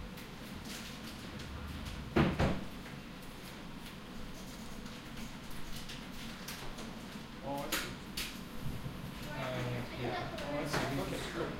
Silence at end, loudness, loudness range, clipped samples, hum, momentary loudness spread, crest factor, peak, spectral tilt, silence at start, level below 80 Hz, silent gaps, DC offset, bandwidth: 0 s; -40 LUFS; 8 LU; under 0.1%; none; 12 LU; 24 dB; -16 dBFS; -5 dB/octave; 0 s; -50 dBFS; none; under 0.1%; 16 kHz